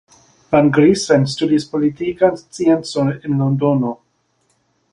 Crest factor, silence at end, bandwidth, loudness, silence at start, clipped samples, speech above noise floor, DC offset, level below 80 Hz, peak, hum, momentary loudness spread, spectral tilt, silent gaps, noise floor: 16 dB; 1 s; 11 kHz; -16 LUFS; 0.5 s; under 0.1%; 48 dB; under 0.1%; -52 dBFS; 0 dBFS; none; 7 LU; -6.5 dB/octave; none; -63 dBFS